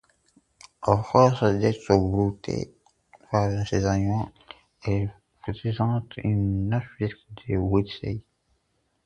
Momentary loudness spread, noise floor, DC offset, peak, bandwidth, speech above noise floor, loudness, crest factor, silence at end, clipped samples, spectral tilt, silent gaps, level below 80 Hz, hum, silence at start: 13 LU; -72 dBFS; under 0.1%; -4 dBFS; 8.8 kHz; 48 dB; -25 LUFS; 22 dB; 0.85 s; under 0.1%; -7.5 dB/octave; none; -44 dBFS; none; 0.8 s